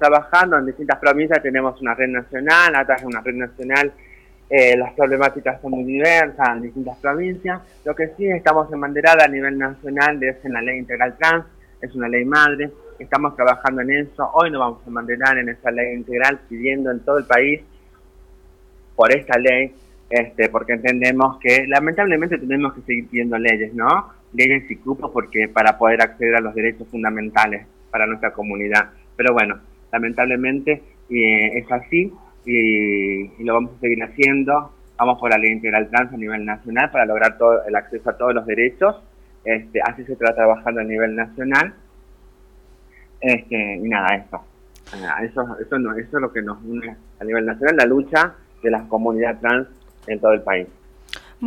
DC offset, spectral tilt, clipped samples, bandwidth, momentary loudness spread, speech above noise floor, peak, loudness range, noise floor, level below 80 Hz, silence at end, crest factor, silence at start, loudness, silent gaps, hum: under 0.1%; -5.5 dB/octave; under 0.1%; 15.5 kHz; 11 LU; 30 dB; 0 dBFS; 4 LU; -48 dBFS; -48 dBFS; 0 s; 18 dB; 0 s; -18 LUFS; none; none